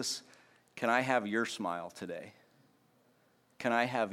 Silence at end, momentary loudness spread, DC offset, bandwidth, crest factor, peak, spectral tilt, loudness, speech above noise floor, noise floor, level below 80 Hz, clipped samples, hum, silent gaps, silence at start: 0 s; 15 LU; under 0.1%; 16.5 kHz; 22 dB; -14 dBFS; -3.5 dB/octave; -34 LUFS; 36 dB; -70 dBFS; -84 dBFS; under 0.1%; none; none; 0 s